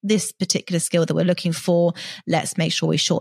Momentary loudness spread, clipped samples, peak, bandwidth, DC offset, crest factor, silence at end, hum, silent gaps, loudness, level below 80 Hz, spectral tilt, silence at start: 3 LU; under 0.1%; -6 dBFS; 14.5 kHz; under 0.1%; 16 dB; 0 s; none; none; -21 LUFS; -66 dBFS; -4.5 dB/octave; 0.05 s